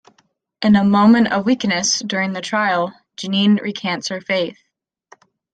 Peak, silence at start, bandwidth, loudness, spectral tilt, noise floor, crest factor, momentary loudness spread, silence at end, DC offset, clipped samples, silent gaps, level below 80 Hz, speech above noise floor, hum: -2 dBFS; 0.6 s; 9 kHz; -17 LUFS; -4.5 dB/octave; -72 dBFS; 16 dB; 10 LU; 1 s; under 0.1%; under 0.1%; none; -58 dBFS; 56 dB; none